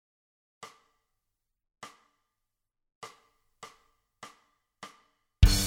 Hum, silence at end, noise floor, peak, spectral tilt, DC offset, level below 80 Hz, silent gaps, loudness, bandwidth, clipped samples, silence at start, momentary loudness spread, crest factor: none; 0 s; -84 dBFS; -6 dBFS; -4 dB/octave; under 0.1%; -34 dBFS; none; -25 LUFS; 16.5 kHz; under 0.1%; 3.05 s; 20 LU; 28 dB